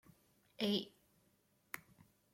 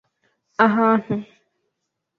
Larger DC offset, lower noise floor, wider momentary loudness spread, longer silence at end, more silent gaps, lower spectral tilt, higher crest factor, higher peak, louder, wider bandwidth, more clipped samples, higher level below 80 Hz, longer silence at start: neither; about the same, -76 dBFS vs -78 dBFS; about the same, 14 LU vs 13 LU; second, 0.55 s vs 0.95 s; neither; second, -5 dB/octave vs -8 dB/octave; about the same, 22 dB vs 22 dB; second, -24 dBFS vs -2 dBFS; second, -42 LUFS vs -19 LUFS; first, 16.5 kHz vs 5.4 kHz; neither; second, -82 dBFS vs -64 dBFS; about the same, 0.6 s vs 0.6 s